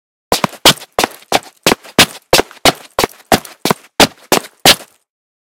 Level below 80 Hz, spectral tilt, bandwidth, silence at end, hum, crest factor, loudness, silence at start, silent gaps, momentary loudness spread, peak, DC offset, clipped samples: -40 dBFS; -2 dB/octave; over 20 kHz; 0.65 s; none; 14 dB; -12 LUFS; 0.3 s; none; 9 LU; 0 dBFS; under 0.1%; 1%